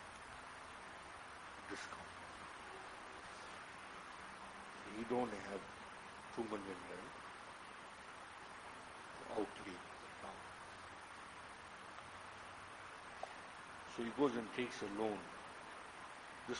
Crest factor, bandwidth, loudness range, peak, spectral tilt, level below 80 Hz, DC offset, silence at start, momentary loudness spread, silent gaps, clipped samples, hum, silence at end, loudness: 26 dB; 10.5 kHz; 8 LU; -22 dBFS; -4 dB/octave; -74 dBFS; under 0.1%; 0 s; 11 LU; none; under 0.1%; none; 0 s; -49 LUFS